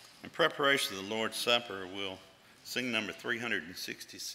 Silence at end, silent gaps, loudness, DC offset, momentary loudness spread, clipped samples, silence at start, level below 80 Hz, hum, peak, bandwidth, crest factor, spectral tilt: 0 s; none; -33 LUFS; under 0.1%; 13 LU; under 0.1%; 0 s; -78 dBFS; none; -12 dBFS; 16 kHz; 24 dB; -2.5 dB/octave